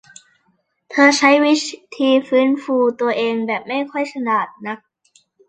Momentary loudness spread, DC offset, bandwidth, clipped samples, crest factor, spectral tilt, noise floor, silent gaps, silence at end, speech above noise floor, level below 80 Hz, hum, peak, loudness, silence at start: 14 LU; under 0.1%; 9.2 kHz; under 0.1%; 18 dB; -3 dB/octave; -65 dBFS; none; 0.7 s; 48 dB; -70 dBFS; none; -2 dBFS; -17 LUFS; 0.9 s